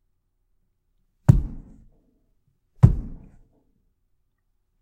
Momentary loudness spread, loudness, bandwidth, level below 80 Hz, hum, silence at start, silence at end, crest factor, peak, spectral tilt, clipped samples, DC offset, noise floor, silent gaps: 19 LU; -21 LUFS; 9 kHz; -34 dBFS; none; 1.3 s; 1.65 s; 26 dB; 0 dBFS; -10 dB/octave; under 0.1%; under 0.1%; -71 dBFS; none